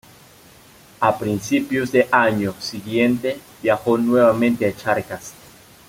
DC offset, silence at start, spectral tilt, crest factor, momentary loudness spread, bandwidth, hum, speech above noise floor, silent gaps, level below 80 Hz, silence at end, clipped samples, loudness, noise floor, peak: under 0.1%; 1 s; -5.5 dB/octave; 18 dB; 11 LU; 16.5 kHz; none; 29 dB; none; -56 dBFS; 0.55 s; under 0.1%; -19 LUFS; -47 dBFS; -2 dBFS